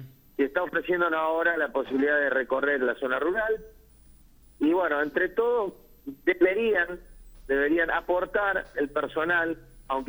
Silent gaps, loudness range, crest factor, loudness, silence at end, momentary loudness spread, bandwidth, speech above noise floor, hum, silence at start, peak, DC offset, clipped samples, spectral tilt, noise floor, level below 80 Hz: none; 2 LU; 16 dB; -26 LUFS; 0 s; 8 LU; over 20 kHz; 28 dB; none; 0 s; -10 dBFS; under 0.1%; under 0.1%; -6 dB/octave; -54 dBFS; -54 dBFS